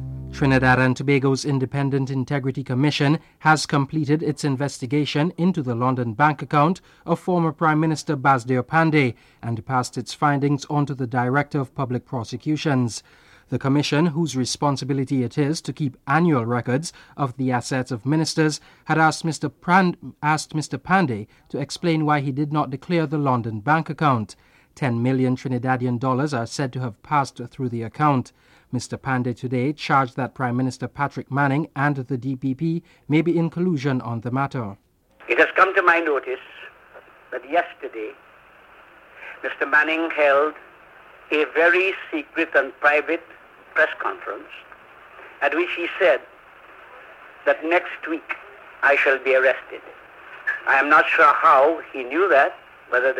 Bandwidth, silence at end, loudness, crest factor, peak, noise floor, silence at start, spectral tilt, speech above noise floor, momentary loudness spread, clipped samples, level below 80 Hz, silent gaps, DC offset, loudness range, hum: 12.5 kHz; 0 s; -21 LUFS; 18 dB; -4 dBFS; -50 dBFS; 0 s; -6 dB/octave; 28 dB; 12 LU; under 0.1%; -54 dBFS; none; under 0.1%; 4 LU; none